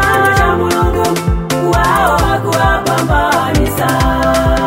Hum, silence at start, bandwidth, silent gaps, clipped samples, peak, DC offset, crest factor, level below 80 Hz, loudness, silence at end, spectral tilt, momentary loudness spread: none; 0 s; 16.5 kHz; none; under 0.1%; 0 dBFS; under 0.1%; 12 dB; -20 dBFS; -12 LUFS; 0 s; -5 dB/octave; 4 LU